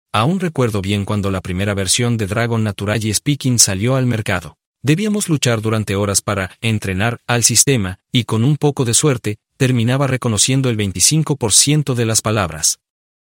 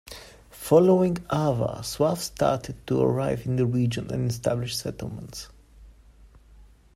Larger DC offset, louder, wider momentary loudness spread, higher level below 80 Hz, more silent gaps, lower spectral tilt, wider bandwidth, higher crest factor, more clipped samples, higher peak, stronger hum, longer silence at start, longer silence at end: neither; first, -16 LUFS vs -25 LUFS; second, 8 LU vs 18 LU; about the same, -48 dBFS vs -50 dBFS; first, 4.66-4.74 s vs none; second, -4 dB/octave vs -6.5 dB/octave; about the same, 16.5 kHz vs 16 kHz; about the same, 16 dB vs 20 dB; neither; first, 0 dBFS vs -6 dBFS; neither; about the same, 0.15 s vs 0.05 s; first, 0.45 s vs 0.3 s